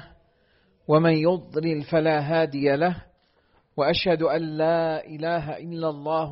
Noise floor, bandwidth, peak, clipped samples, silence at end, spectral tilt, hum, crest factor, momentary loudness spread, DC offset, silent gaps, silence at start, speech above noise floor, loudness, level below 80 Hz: -64 dBFS; 5.8 kHz; -8 dBFS; under 0.1%; 0 s; -5 dB/octave; none; 16 dB; 9 LU; under 0.1%; none; 0 s; 41 dB; -24 LUFS; -56 dBFS